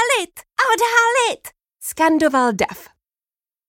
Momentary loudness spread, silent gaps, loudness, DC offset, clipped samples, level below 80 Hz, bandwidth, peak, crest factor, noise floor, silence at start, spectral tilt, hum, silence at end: 16 LU; none; -17 LUFS; under 0.1%; under 0.1%; -58 dBFS; 17 kHz; 0 dBFS; 18 dB; under -90 dBFS; 0 s; -2.5 dB/octave; none; 0.85 s